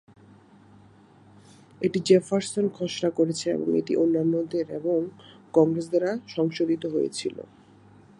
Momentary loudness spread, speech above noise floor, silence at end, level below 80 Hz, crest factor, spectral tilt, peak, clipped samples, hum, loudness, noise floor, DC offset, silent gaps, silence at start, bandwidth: 8 LU; 29 dB; 0.8 s; -70 dBFS; 20 dB; -6 dB/octave; -6 dBFS; under 0.1%; none; -25 LUFS; -54 dBFS; under 0.1%; none; 1.8 s; 11 kHz